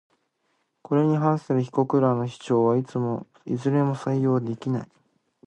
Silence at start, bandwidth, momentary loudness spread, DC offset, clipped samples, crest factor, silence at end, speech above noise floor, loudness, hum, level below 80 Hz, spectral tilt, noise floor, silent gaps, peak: 0.9 s; 9.2 kHz; 8 LU; under 0.1%; under 0.1%; 16 dB; 0.6 s; 49 dB; -24 LUFS; none; -68 dBFS; -9 dB/octave; -72 dBFS; none; -8 dBFS